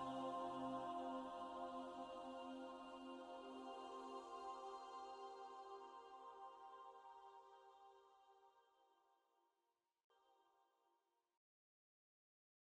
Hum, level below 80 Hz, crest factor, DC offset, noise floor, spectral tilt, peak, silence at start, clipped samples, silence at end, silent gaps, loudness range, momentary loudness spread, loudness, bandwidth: none; -88 dBFS; 18 dB; under 0.1%; under -90 dBFS; -5 dB/octave; -36 dBFS; 0 s; under 0.1%; 1.95 s; 10.04-10.10 s; 13 LU; 14 LU; -53 LUFS; 11 kHz